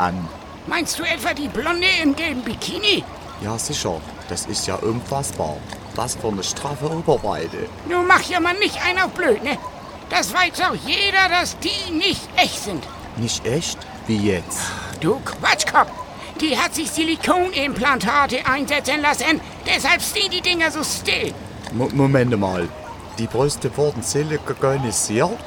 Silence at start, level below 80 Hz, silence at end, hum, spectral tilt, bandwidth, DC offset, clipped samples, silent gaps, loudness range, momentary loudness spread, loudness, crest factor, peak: 0 s; -44 dBFS; 0 s; none; -3.5 dB/octave; 19 kHz; under 0.1%; under 0.1%; none; 5 LU; 12 LU; -20 LUFS; 20 dB; 0 dBFS